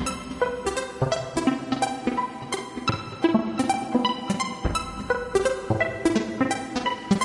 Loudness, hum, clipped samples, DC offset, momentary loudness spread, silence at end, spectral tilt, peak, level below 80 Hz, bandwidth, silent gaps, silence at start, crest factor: -26 LUFS; none; under 0.1%; under 0.1%; 5 LU; 0 s; -5 dB/octave; -8 dBFS; -44 dBFS; 11.5 kHz; none; 0 s; 18 dB